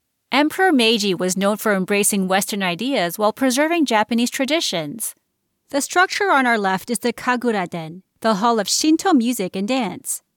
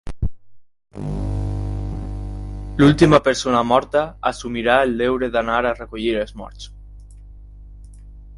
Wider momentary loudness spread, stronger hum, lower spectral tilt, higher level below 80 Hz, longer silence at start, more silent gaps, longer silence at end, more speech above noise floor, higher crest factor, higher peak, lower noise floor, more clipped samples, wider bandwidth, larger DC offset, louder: second, 8 LU vs 18 LU; second, none vs 50 Hz at -35 dBFS; second, -3.5 dB/octave vs -6 dB/octave; second, -68 dBFS vs -32 dBFS; first, 0.3 s vs 0.05 s; neither; first, 0.2 s vs 0 s; first, 52 dB vs 22 dB; second, 14 dB vs 20 dB; second, -4 dBFS vs 0 dBFS; first, -71 dBFS vs -40 dBFS; neither; first, 19 kHz vs 11.5 kHz; neither; about the same, -19 LUFS vs -19 LUFS